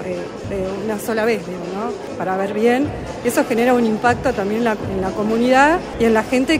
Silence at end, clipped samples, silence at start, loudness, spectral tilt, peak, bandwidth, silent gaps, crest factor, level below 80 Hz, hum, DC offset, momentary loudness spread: 0 s; under 0.1%; 0 s; -19 LUFS; -5.5 dB/octave; -2 dBFS; 16 kHz; none; 16 dB; -42 dBFS; none; under 0.1%; 10 LU